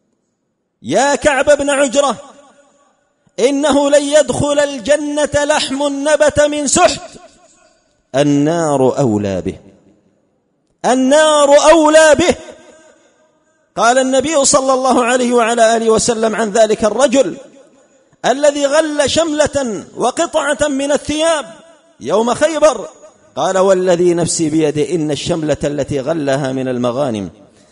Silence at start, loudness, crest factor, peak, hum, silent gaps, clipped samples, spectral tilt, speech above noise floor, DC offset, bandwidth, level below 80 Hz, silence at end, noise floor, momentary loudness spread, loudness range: 0.85 s; -13 LUFS; 14 dB; 0 dBFS; none; none; under 0.1%; -3.5 dB/octave; 55 dB; under 0.1%; 11 kHz; -44 dBFS; 0.4 s; -68 dBFS; 9 LU; 5 LU